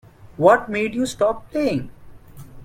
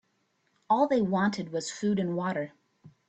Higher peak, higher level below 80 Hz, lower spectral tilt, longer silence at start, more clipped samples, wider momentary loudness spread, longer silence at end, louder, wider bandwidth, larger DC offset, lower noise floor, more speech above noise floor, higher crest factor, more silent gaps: first, -2 dBFS vs -12 dBFS; first, -48 dBFS vs -70 dBFS; about the same, -5.5 dB/octave vs -6 dB/octave; second, 0.25 s vs 0.7 s; neither; about the same, 9 LU vs 9 LU; second, 0 s vs 0.2 s; first, -20 LUFS vs -28 LUFS; first, 16 kHz vs 8.8 kHz; neither; second, -40 dBFS vs -73 dBFS; second, 21 dB vs 46 dB; about the same, 20 dB vs 18 dB; neither